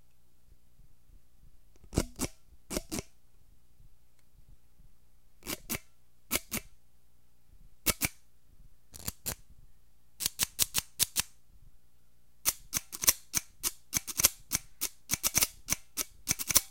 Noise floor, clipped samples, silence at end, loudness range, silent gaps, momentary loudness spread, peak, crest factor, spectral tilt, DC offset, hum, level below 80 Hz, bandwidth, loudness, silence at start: -68 dBFS; under 0.1%; 0 s; 12 LU; none; 13 LU; 0 dBFS; 36 dB; -1 dB/octave; 0.2%; 60 Hz at -70 dBFS; -52 dBFS; 17 kHz; -32 LUFS; 0.9 s